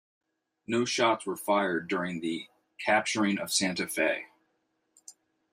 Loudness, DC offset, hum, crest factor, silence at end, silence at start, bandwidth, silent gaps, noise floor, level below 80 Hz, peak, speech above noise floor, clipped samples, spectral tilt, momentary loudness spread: -29 LUFS; under 0.1%; none; 20 dB; 0.4 s; 0.7 s; 15.5 kHz; none; -76 dBFS; -76 dBFS; -10 dBFS; 48 dB; under 0.1%; -3 dB/octave; 9 LU